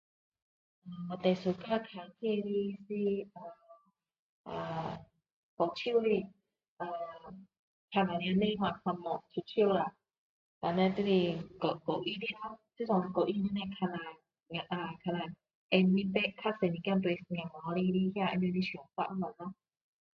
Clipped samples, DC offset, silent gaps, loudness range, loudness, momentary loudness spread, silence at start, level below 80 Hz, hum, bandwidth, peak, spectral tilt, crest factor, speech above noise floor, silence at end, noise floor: under 0.1%; under 0.1%; 4.19-4.44 s, 5.32-5.57 s, 6.68-6.77 s, 7.59-7.88 s, 10.18-10.61 s, 15.55-15.69 s; 5 LU; -34 LUFS; 14 LU; 0.85 s; -70 dBFS; none; 6.2 kHz; -12 dBFS; -8.5 dB/octave; 22 dB; 30 dB; 0.6 s; -63 dBFS